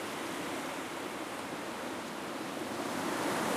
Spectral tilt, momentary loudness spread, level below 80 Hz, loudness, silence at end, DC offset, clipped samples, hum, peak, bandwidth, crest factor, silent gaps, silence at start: -3.5 dB/octave; 6 LU; -72 dBFS; -37 LUFS; 0 s; under 0.1%; under 0.1%; none; -22 dBFS; 15.5 kHz; 16 dB; none; 0 s